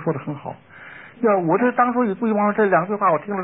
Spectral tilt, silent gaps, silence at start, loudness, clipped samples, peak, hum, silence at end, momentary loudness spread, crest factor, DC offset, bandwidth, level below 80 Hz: -12.5 dB/octave; none; 0 s; -19 LUFS; under 0.1%; -6 dBFS; none; 0 s; 21 LU; 14 dB; 0.1%; 3.9 kHz; -66 dBFS